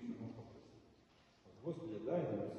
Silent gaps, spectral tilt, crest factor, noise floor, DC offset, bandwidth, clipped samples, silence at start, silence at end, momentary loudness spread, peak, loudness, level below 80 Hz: none; -9 dB/octave; 18 dB; -69 dBFS; under 0.1%; 8.4 kHz; under 0.1%; 0 s; 0 s; 24 LU; -28 dBFS; -45 LUFS; -76 dBFS